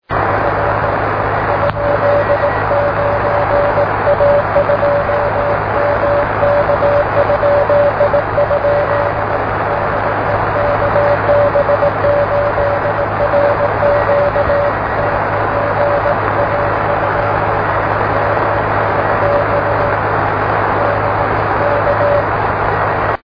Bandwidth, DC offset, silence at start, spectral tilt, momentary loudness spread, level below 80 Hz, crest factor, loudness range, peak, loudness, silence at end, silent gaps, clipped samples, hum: 5.2 kHz; under 0.1%; 0.1 s; -9 dB/octave; 3 LU; -32 dBFS; 14 dB; 1 LU; 0 dBFS; -14 LUFS; 0.05 s; none; under 0.1%; none